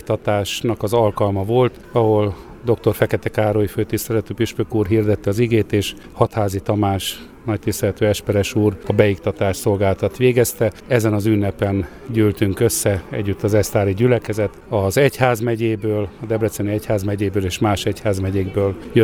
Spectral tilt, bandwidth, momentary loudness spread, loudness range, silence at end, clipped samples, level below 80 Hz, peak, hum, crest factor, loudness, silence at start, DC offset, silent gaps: -6 dB/octave; over 20 kHz; 6 LU; 2 LU; 0 s; under 0.1%; -42 dBFS; 0 dBFS; none; 18 dB; -19 LUFS; 0.05 s; under 0.1%; none